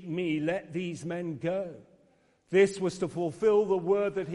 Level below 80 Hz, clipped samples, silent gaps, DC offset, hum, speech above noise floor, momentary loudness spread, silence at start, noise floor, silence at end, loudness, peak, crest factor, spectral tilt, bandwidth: -66 dBFS; under 0.1%; none; under 0.1%; none; 37 dB; 10 LU; 0 s; -66 dBFS; 0 s; -29 LUFS; -10 dBFS; 18 dB; -6.5 dB/octave; 11.5 kHz